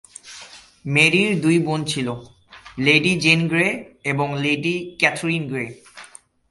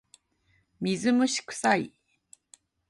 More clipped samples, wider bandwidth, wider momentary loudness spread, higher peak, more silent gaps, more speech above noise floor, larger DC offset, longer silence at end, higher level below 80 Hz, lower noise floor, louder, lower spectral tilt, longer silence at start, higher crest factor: neither; about the same, 11.5 kHz vs 11.5 kHz; first, 20 LU vs 9 LU; first, 0 dBFS vs -8 dBFS; neither; second, 26 dB vs 44 dB; neither; second, 0.45 s vs 1 s; first, -56 dBFS vs -72 dBFS; second, -46 dBFS vs -69 dBFS; first, -19 LUFS vs -27 LUFS; about the same, -4.5 dB/octave vs -4 dB/octave; second, 0.25 s vs 0.8 s; about the same, 22 dB vs 22 dB